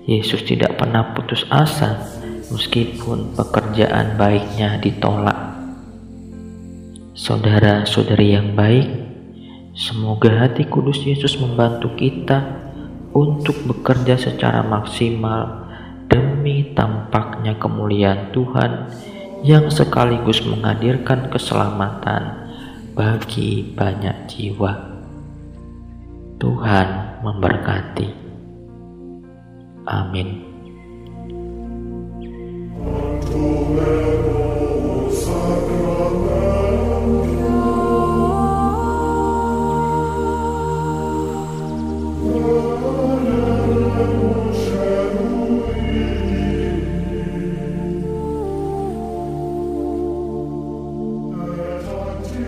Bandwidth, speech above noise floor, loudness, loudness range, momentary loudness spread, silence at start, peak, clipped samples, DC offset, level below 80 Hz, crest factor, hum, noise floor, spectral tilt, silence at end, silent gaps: 15.5 kHz; 23 dB; -19 LUFS; 8 LU; 18 LU; 0 s; 0 dBFS; under 0.1%; 0.2%; -34 dBFS; 18 dB; none; -40 dBFS; -7 dB/octave; 0 s; none